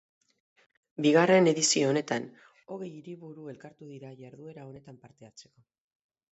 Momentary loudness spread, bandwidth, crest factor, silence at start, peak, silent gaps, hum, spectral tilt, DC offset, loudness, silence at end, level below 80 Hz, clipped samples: 25 LU; 8.2 kHz; 20 dB; 1 s; -10 dBFS; none; none; -4 dB/octave; under 0.1%; -24 LUFS; 0.9 s; -78 dBFS; under 0.1%